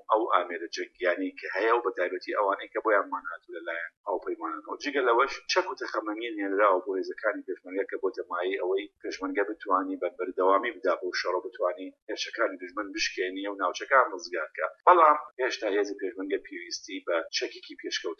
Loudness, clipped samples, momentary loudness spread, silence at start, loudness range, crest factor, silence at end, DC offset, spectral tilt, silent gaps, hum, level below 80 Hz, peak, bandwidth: -29 LUFS; under 0.1%; 11 LU; 0.1 s; 5 LU; 24 dB; 0.05 s; under 0.1%; -1 dB/octave; 3.97-4.04 s, 12.02-12.07 s, 15.33-15.37 s; none; -74 dBFS; -6 dBFS; 7 kHz